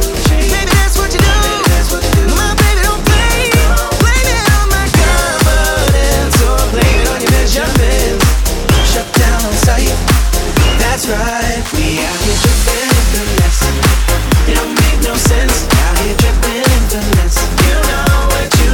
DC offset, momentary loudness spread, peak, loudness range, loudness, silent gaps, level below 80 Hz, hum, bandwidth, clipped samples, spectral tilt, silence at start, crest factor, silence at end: under 0.1%; 2 LU; 0 dBFS; 2 LU; -12 LUFS; none; -12 dBFS; none; 18.5 kHz; under 0.1%; -4 dB/octave; 0 s; 10 dB; 0 s